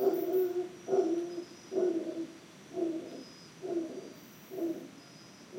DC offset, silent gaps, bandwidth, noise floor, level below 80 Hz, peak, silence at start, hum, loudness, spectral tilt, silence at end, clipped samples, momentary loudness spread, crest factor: under 0.1%; none; 16.5 kHz; -53 dBFS; -84 dBFS; -18 dBFS; 0 s; none; -35 LUFS; -5.5 dB/octave; 0 s; under 0.1%; 19 LU; 18 dB